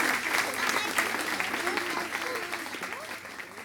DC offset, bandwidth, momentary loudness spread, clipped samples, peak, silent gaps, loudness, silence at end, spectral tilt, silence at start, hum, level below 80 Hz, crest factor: under 0.1%; 19.5 kHz; 11 LU; under 0.1%; -10 dBFS; none; -29 LUFS; 0 s; -1 dB/octave; 0 s; none; -68 dBFS; 22 dB